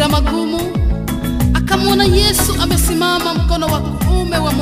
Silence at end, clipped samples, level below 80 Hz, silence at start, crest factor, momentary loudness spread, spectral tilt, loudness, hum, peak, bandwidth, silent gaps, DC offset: 0 s; under 0.1%; -20 dBFS; 0 s; 14 dB; 7 LU; -4.5 dB/octave; -15 LUFS; none; 0 dBFS; 15.5 kHz; none; under 0.1%